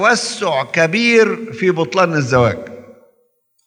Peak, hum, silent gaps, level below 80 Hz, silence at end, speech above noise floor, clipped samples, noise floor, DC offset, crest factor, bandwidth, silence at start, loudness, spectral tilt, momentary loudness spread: 0 dBFS; none; none; -54 dBFS; 0.75 s; 47 dB; under 0.1%; -62 dBFS; under 0.1%; 16 dB; 11 kHz; 0 s; -15 LUFS; -4.5 dB/octave; 7 LU